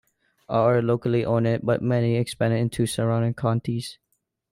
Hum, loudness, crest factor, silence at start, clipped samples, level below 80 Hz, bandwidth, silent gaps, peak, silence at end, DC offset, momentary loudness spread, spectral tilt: none; -23 LUFS; 14 dB; 0.5 s; under 0.1%; -56 dBFS; 15 kHz; none; -8 dBFS; 0.6 s; under 0.1%; 6 LU; -7 dB/octave